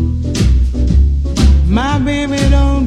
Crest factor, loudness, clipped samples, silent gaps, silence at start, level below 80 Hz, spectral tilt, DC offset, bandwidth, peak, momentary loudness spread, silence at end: 10 dB; -13 LUFS; under 0.1%; none; 0 s; -12 dBFS; -6.5 dB/octave; under 0.1%; 10 kHz; 0 dBFS; 4 LU; 0 s